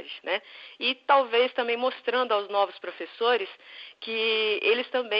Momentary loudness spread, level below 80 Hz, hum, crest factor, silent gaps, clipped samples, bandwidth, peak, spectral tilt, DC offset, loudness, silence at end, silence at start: 15 LU; under -90 dBFS; none; 18 dB; none; under 0.1%; 5.6 kHz; -8 dBFS; -4.5 dB/octave; under 0.1%; -26 LUFS; 0 s; 0 s